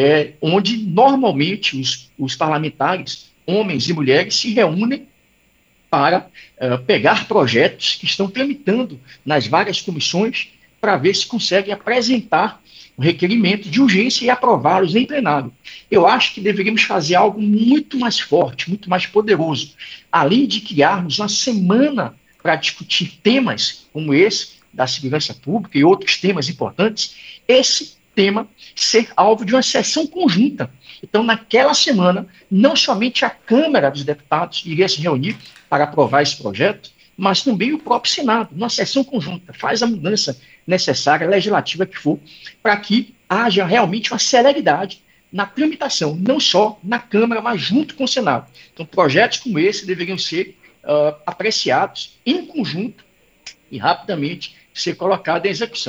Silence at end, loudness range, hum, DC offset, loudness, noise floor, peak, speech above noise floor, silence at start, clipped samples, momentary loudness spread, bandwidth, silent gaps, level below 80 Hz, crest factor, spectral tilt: 0 s; 3 LU; none; under 0.1%; -17 LUFS; -57 dBFS; 0 dBFS; 41 dB; 0 s; under 0.1%; 10 LU; 8.4 kHz; none; -62 dBFS; 18 dB; -4 dB/octave